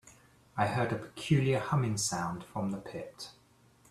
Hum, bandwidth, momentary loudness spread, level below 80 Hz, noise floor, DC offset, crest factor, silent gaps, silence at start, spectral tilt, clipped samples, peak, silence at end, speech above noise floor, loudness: none; 13.5 kHz; 15 LU; -62 dBFS; -63 dBFS; under 0.1%; 20 dB; none; 0.05 s; -5 dB/octave; under 0.1%; -14 dBFS; 0.6 s; 31 dB; -32 LUFS